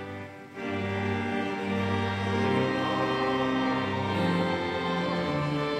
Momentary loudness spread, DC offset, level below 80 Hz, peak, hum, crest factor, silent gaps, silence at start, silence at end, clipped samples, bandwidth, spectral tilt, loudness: 5 LU; under 0.1%; -58 dBFS; -14 dBFS; none; 14 dB; none; 0 s; 0 s; under 0.1%; 12.5 kHz; -6.5 dB/octave; -28 LUFS